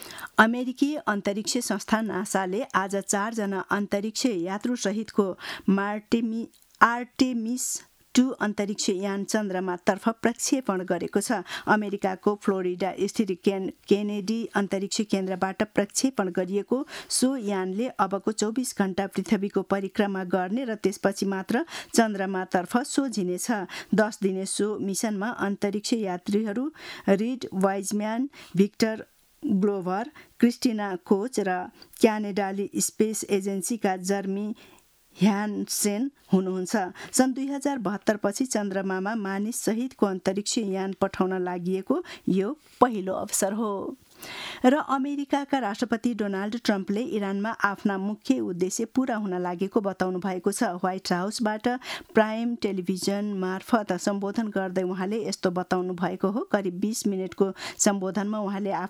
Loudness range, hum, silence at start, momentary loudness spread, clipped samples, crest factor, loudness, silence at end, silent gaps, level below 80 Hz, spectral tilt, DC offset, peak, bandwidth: 1 LU; none; 0 s; 5 LU; under 0.1%; 26 dB; -27 LUFS; 0 s; none; -66 dBFS; -4.5 dB/octave; under 0.1%; -2 dBFS; 16 kHz